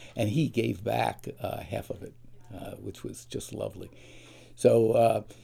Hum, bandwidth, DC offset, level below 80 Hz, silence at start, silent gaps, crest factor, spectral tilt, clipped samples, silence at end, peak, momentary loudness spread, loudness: none; 16.5 kHz; under 0.1%; -58 dBFS; 0 s; none; 22 dB; -6.5 dB/octave; under 0.1%; 0 s; -8 dBFS; 20 LU; -28 LUFS